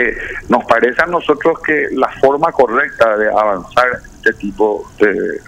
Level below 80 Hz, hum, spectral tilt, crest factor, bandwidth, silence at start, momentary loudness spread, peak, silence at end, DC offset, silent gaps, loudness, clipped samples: -42 dBFS; none; -5.5 dB/octave; 14 dB; 12.5 kHz; 0 s; 5 LU; 0 dBFS; 0.1 s; under 0.1%; none; -14 LUFS; under 0.1%